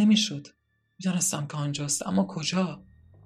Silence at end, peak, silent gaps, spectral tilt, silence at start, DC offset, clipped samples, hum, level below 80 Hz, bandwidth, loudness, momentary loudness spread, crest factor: 0.45 s; -12 dBFS; none; -4 dB/octave; 0 s; under 0.1%; under 0.1%; none; -64 dBFS; 15.5 kHz; -27 LUFS; 9 LU; 16 dB